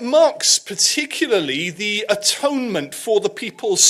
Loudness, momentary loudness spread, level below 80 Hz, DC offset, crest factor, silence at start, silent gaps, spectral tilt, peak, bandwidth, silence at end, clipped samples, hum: -18 LUFS; 9 LU; -68 dBFS; under 0.1%; 16 dB; 0 s; none; -1 dB/octave; -2 dBFS; 16 kHz; 0 s; under 0.1%; none